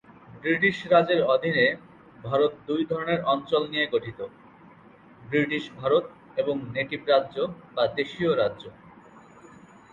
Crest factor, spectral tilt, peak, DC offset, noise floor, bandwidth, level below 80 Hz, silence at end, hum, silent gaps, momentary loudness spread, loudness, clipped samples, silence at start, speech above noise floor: 20 dB; -6.5 dB/octave; -6 dBFS; under 0.1%; -52 dBFS; 7.4 kHz; -64 dBFS; 0.75 s; none; none; 12 LU; -25 LUFS; under 0.1%; 0.3 s; 27 dB